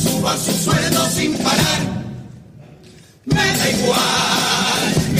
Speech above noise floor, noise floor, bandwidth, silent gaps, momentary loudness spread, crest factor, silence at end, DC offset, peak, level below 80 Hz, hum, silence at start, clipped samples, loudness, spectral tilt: 27 dB; -44 dBFS; 15.5 kHz; none; 9 LU; 16 dB; 0 s; under 0.1%; -2 dBFS; -42 dBFS; none; 0 s; under 0.1%; -16 LUFS; -3.5 dB/octave